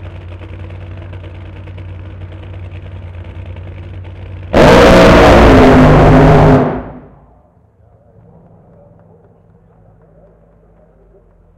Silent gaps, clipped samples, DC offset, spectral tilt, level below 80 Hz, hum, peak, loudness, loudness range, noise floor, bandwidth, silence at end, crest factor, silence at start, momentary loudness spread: none; under 0.1%; under 0.1%; -7 dB/octave; -22 dBFS; none; 0 dBFS; -6 LUFS; 22 LU; -47 dBFS; 15.5 kHz; 4.65 s; 12 dB; 0 s; 25 LU